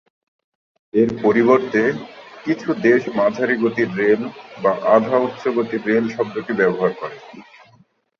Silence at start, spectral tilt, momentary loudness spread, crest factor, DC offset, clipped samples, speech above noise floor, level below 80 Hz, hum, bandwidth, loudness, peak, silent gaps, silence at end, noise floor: 0.95 s; -7 dB/octave; 12 LU; 18 dB; under 0.1%; under 0.1%; 37 dB; -62 dBFS; none; 7 kHz; -18 LUFS; -2 dBFS; none; 0.8 s; -55 dBFS